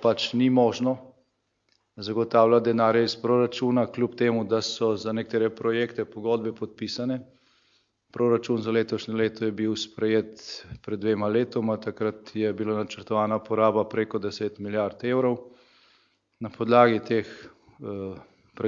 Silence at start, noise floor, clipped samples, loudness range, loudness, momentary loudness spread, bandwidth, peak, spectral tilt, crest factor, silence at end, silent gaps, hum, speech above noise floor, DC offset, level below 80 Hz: 0 s; -73 dBFS; under 0.1%; 5 LU; -25 LUFS; 14 LU; 7.6 kHz; -4 dBFS; -6 dB/octave; 20 dB; 0 s; none; none; 48 dB; under 0.1%; -68 dBFS